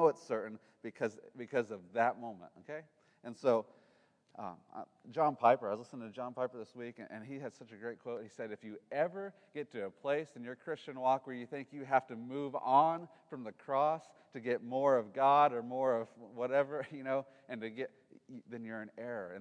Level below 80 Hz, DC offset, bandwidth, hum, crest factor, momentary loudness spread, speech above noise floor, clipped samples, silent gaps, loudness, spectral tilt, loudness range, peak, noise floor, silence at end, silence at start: under -90 dBFS; under 0.1%; 10 kHz; none; 22 dB; 18 LU; 34 dB; under 0.1%; none; -36 LUFS; -6.5 dB/octave; 8 LU; -14 dBFS; -71 dBFS; 0 s; 0 s